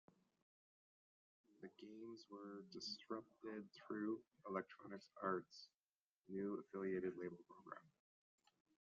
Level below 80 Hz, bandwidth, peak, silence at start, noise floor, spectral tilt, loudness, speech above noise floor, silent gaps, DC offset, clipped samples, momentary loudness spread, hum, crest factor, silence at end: under -90 dBFS; 7.2 kHz; -28 dBFS; 1.6 s; under -90 dBFS; -4 dB/octave; -51 LUFS; over 40 dB; 5.75-6.22 s; under 0.1%; under 0.1%; 14 LU; none; 24 dB; 0.95 s